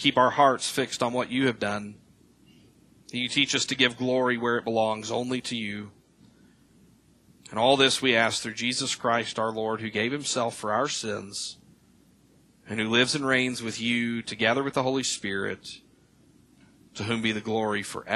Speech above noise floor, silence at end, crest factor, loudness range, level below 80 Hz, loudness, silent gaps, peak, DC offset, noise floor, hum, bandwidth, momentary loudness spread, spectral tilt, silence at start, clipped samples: 33 dB; 0 s; 22 dB; 5 LU; -66 dBFS; -26 LUFS; none; -4 dBFS; under 0.1%; -60 dBFS; none; 13 kHz; 13 LU; -3 dB/octave; 0 s; under 0.1%